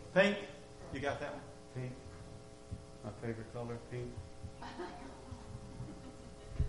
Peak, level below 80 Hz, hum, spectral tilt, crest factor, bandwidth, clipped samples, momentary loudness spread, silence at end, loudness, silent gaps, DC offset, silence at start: -16 dBFS; -52 dBFS; none; -6 dB/octave; 26 dB; 11.5 kHz; under 0.1%; 13 LU; 0 s; -42 LUFS; none; under 0.1%; 0 s